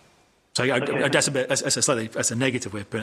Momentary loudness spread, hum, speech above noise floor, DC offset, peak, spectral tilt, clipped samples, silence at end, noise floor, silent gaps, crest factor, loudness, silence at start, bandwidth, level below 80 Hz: 8 LU; none; 36 dB; under 0.1%; -4 dBFS; -3 dB/octave; under 0.1%; 0 s; -60 dBFS; none; 20 dB; -23 LUFS; 0.55 s; 15 kHz; -60 dBFS